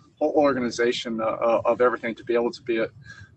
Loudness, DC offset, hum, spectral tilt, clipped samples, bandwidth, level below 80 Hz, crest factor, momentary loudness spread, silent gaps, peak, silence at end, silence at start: -24 LUFS; under 0.1%; none; -5 dB/octave; under 0.1%; 8.6 kHz; -62 dBFS; 16 dB; 6 LU; none; -8 dBFS; 0.1 s; 0.2 s